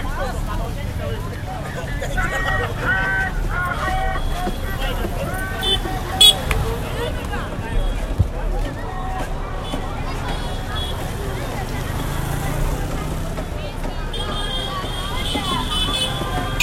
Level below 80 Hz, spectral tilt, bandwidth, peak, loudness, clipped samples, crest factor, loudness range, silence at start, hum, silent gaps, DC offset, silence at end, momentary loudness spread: -26 dBFS; -3.5 dB/octave; 16.5 kHz; 0 dBFS; -22 LUFS; under 0.1%; 22 dB; 8 LU; 0 s; none; none; under 0.1%; 0 s; 8 LU